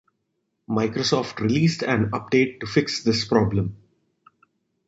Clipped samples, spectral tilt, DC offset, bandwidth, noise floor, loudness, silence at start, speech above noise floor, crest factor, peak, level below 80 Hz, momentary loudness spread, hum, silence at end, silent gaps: under 0.1%; -5.5 dB/octave; under 0.1%; 8 kHz; -75 dBFS; -23 LUFS; 0.7 s; 54 dB; 20 dB; -4 dBFS; -50 dBFS; 4 LU; none; 1.1 s; none